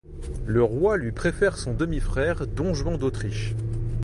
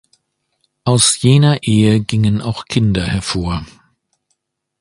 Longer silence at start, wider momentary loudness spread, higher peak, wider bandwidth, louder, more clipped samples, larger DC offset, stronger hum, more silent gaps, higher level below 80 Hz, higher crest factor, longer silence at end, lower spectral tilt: second, 0.05 s vs 0.85 s; about the same, 7 LU vs 9 LU; second, -10 dBFS vs 0 dBFS; about the same, 11.5 kHz vs 11.5 kHz; second, -26 LUFS vs -14 LUFS; neither; neither; neither; neither; about the same, -32 dBFS vs -36 dBFS; about the same, 16 dB vs 16 dB; second, 0 s vs 1.15 s; first, -6.5 dB/octave vs -5 dB/octave